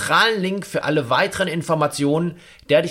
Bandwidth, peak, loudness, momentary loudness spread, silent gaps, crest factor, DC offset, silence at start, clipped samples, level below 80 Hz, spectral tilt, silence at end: 16.5 kHz; -2 dBFS; -20 LUFS; 7 LU; none; 16 dB; under 0.1%; 0 s; under 0.1%; -56 dBFS; -4.5 dB/octave; 0 s